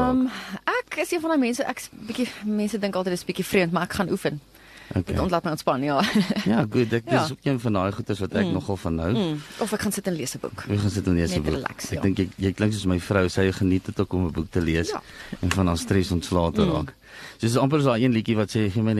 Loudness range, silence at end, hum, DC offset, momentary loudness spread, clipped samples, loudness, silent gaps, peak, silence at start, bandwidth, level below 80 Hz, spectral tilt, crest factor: 3 LU; 0 s; none; under 0.1%; 8 LU; under 0.1%; -25 LUFS; none; -4 dBFS; 0 s; 13 kHz; -44 dBFS; -6 dB/octave; 20 dB